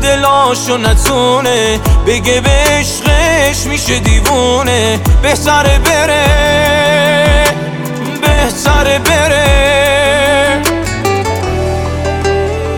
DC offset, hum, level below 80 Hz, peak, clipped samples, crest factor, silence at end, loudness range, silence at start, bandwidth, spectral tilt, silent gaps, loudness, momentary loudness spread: under 0.1%; none; -16 dBFS; 0 dBFS; under 0.1%; 10 dB; 0 s; 1 LU; 0 s; 18.5 kHz; -4 dB/octave; none; -10 LUFS; 6 LU